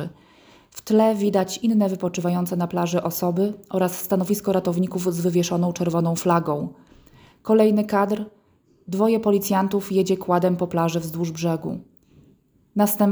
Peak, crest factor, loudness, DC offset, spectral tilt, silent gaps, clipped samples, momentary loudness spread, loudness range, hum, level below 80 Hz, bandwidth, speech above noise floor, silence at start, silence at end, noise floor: -6 dBFS; 16 dB; -22 LUFS; under 0.1%; -6.5 dB/octave; none; under 0.1%; 10 LU; 2 LU; none; -60 dBFS; over 20 kHz; 37 dB; 0 s; 0 s; -58 dBFS